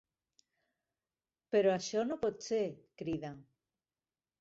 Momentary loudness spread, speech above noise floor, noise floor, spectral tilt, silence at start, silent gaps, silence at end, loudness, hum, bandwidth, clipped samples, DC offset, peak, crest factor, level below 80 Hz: 11 LU; over 56 dB; under -90 dBFS; -5 dB/octave; 1.5 s; none; 1 s; -35 LUFS; none; 8 kHz; under 0.1%; under 0.1%; -18 dBFS; 20 dB; -72 dBFS